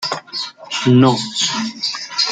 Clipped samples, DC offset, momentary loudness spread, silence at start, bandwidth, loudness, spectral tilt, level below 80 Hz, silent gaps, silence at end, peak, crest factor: under 0.1%; under 0.1%; 12 LU; 0 s; 9.4 kHz; -17 LUFS; -4.5 dB/octave; -58 dBFS; none; 0 s; -2 dBFS; 16 dB